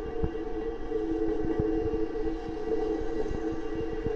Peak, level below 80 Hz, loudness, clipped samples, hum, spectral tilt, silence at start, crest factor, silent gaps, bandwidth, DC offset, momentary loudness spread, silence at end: -14 dBFS; -40 dBFS; -32 LUFS; under 0.1%; none; -8 dB/octave; 0 s; 16 dB; none; 7 kHz; under 0.1%; 5 LU; 0 s